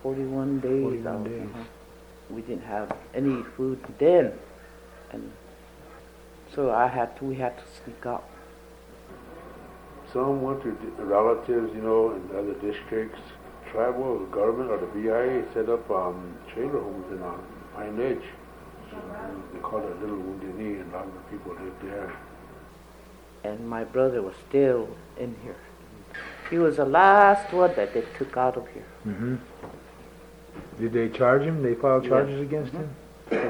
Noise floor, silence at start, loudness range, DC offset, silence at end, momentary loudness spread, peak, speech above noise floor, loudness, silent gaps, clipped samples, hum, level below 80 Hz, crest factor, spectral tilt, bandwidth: -48 dBFS; 0 s; 13 LU; under 0.1%; 0 s; 22 LU; -4 dBFS; 23 dB; -26 LUFS; none; under 0.1%; none; -54 dBFS; 24 dB; -7.5 dB/octave; over 20 kHz